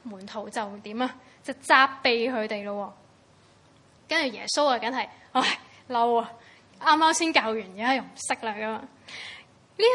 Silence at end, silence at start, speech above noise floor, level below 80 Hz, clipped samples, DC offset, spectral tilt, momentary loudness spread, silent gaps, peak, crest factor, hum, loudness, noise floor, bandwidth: 0 s; 0.05 s; 31 dB; -76 dBFS; under 0.1%; under 0.1%; -2 dB/octave; 19 LU; none; -4 dBFS; 24 dB; none; -25 LUFS; -58 dBFS; 11.5 kHz